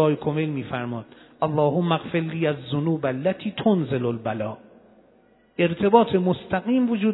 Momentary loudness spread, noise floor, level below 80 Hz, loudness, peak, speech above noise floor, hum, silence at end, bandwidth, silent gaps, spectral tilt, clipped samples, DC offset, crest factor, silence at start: 12 LU; -58 dBFS; -60 dBFS; -23 LUFS; -2 dBFS; 35 dB; none; 0 s; 4.1 kHz; none; -11 dB/octave; under 0.1%; under 0.1%; 22 dB; 0 s